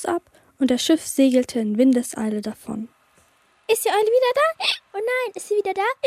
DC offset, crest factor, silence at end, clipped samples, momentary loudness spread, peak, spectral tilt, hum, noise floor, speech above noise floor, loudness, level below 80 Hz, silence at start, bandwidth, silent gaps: under 0.1%; 14 dB; 0 s; under 0.1%; 12 LU; -6 dBFS; -3.5 dB/octave; none; -59 dBFS; 39 dB; -21 LUFS; -64 dBFS; 0 s; 16 kHz; none